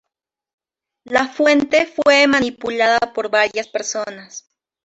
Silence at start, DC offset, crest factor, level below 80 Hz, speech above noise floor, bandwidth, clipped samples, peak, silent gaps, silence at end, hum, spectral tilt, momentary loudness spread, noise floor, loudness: 1.05 s; under 0.1%; 18 dB; -56 dBFS; 66 dB; 8.2 kHz; under 0.1%; -2 dBFS; none; 0.45 s; none; -2.5 dB/octave; 15 LU; -83 dBFS; -16 LUFS